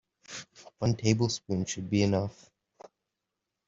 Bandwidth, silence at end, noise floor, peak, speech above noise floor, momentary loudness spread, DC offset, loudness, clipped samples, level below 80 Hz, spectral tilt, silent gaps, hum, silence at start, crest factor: 7.8 kHz; 1.35 s; -86 dBFS; -10 dBFS; 57 dB; 16 LU; under 0.1%; -29 LUFS; under 0.1%; -60 dBFS; -5.5 dB/octave; none; none; 0.3 s; 22 dB